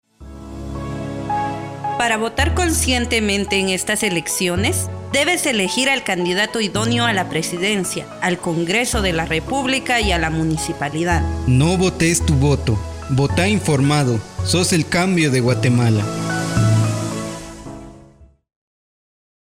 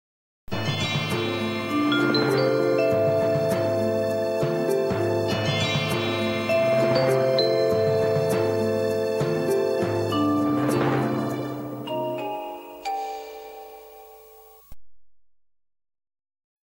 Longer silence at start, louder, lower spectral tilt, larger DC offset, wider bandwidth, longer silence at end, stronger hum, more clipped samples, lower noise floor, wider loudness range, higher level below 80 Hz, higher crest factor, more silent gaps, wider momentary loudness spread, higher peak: second, 0.2 s vs 0.5 s; first, -18 LUFS vs -24 LUFS; second, -4.5 dB/octave vs -6 dB/octave; neither; about the same, 16 kHz vs 16 kHz; second, 1.25 s vs 1.45 s; neither; neither; about the same, -47 dBFS vs -50 dBFS; second, 3 LU vs 11 LU; first, -32 dBFS vs -56 dBFS; about the same, 14 dB vs 16 dB; neither; about the same, 9 LU vs 11 LU; first, -4 dBFS vs -8 dBFS